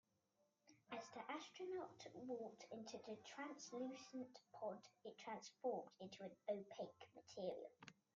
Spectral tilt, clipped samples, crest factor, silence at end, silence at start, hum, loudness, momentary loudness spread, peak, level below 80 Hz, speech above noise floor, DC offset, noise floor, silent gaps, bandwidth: -4 dB/octave; under 0.1%; 20 dB; 0.25 s; 0.65 s; none; -54 LUFS; 8 LU; -34 dBFS; under -90 dBFS; 32 dB; under 0.1%; -86 dBFS; none; 7.8 kHz